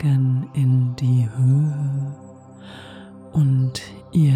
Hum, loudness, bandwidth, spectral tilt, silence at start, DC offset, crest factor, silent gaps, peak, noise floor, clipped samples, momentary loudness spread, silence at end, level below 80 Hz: none; -20 LUFS; 10 kHz; -8 dB/octave; 0 s; under 0.1%; 12 dB; none; -8 dBFS; -42 dBFS; under 0.1%; 21 LU; 0 s; -54 dBFS